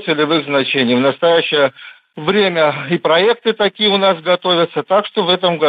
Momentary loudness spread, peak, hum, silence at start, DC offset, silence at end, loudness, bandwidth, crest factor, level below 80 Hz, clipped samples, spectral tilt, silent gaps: 4 LU; -2 dBFS; none; 0 s; under 0.1%; 0 s; -14 LUFS; 5 kHz; 12 dB; -62 dBFS; under 0.1%; -7.5 dB/octave; none